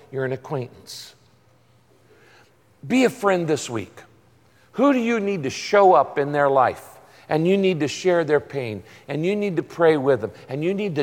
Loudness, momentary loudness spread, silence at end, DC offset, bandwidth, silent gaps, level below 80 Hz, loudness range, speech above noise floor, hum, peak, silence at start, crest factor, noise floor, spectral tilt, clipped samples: -21 LUFS; 14 LU; 0 s; under 0.1%; 16.5 kHz; none; -66 dBFS; 6 LU; 37 dB; none; -4 dBFS; 0.1 s; 18 dB; -58 dBFS; -6 dB/octave; under 0.1%